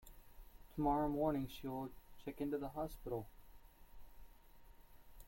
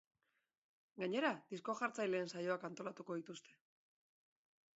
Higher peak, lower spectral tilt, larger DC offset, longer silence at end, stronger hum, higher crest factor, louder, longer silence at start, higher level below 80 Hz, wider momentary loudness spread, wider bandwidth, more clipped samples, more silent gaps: about the same, -24 dBFS vs -22 dBFS; first, -7.5 dB/octave vs -3.5 dB/octave; neither; second, 0 s vs 1.35 s; neither; about the same, 20 dB vs 22 dB; about the same, -42 LUFS vs -43 LUFS; second, 0 s vs 0.95 s; first, -58 dBFS vs under -90 dBFS; first, 16 LU vs 12 LU; first, 16.5 kHz vs 7.6 kHz; neither; neither